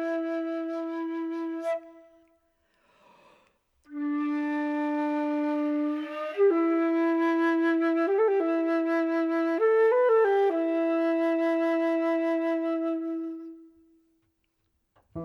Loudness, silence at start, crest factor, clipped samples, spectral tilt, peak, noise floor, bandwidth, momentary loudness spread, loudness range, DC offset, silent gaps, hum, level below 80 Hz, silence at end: -26 LUFS; 0 s; 14 dB; under 0.1%; -6.5 dB/octave; -14 dBFS; -75 dBFS; 6.2 kHz; 10 LU; 10 LU; under 0.1%; none; none; -74 dBFS; 0 s